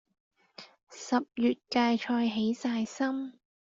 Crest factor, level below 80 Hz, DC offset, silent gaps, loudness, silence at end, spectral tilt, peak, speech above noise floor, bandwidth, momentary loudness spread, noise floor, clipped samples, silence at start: 18 dB; -74 dBFS; under 0.1%; 0.83-0.87 s; -30 LUFS; 0.45 s; -4.5 dB/octave; -14 dBFS; 24 dB; 7.6 kHz; 22 LU; -54 dBFS; under 0.1%; 0.6 s